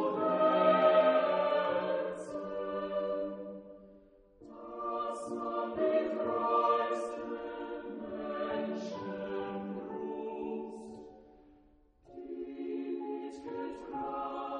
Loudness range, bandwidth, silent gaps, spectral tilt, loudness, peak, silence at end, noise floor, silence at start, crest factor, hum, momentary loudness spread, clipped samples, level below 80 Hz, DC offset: 12 LU; 10 kHz; none; -6 dB/octave; -33 LUFS; -14 dBFS; 0 s; -64 dBFS; 0 s; 20 dB; none; 18 LU; under 0.1%; -70 dBFS; under 0.1%